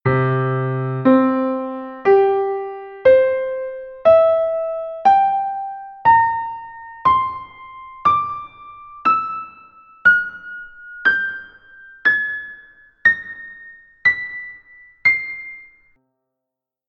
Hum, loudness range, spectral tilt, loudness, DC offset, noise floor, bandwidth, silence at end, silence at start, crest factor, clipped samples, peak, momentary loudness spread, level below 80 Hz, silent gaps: none; 4 LU; -8.5 dB/octave; -17 LUFS; under 0.1%; -84 dBFS; 6.4 kHz; 1.25 s; 0.05 s; 18 dB; under 0.1%; -2 dBFS; 20 LU; -54 dBFS; none